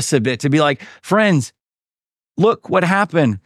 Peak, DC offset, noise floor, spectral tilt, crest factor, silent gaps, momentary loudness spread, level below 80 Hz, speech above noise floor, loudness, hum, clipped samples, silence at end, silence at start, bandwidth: -2 dBFS; under 0.1%; under -90 dBFS; -5.5 dB/octave; 16 dB; none; 9 LU; -62 dBFS; over 74 dB; -16 LUFS; none; under 0.1%; 0.1 s; 0 s; 14 kHz